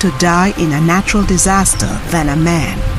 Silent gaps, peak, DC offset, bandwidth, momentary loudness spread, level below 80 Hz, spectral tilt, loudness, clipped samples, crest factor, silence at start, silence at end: none; 0 dBFS; under 0.1%; 15.5 kHz; 6 LU; -22 dBFS; -4.5 dB/octave; -13 LUFS; under 0.1%; 12 dB; 0 s; 0 s